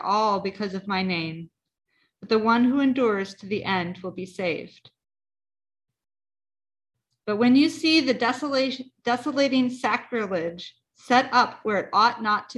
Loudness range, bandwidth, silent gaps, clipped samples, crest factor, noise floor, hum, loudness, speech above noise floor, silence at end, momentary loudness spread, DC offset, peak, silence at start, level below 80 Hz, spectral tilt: 9 LU; 11.5 kHz; none; under 0.1%; 20 dB; under -90 dBFS; none; -24 LUFS; over 66 dB; 0.05 s; 13 LU; under 0.1%; -4 dBFS; 0 s; -66 dBFS; -5 dB/octave